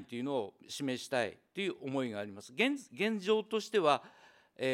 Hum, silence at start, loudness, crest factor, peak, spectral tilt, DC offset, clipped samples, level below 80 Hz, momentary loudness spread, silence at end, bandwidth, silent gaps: none; 0 s; -35 LUFS; 20 dB; -14 dBFS; -4.5 dB/octave; under 0.1%; under 0.1%; -86 dBFS; 8 LU; 0 s; 16 kHz; none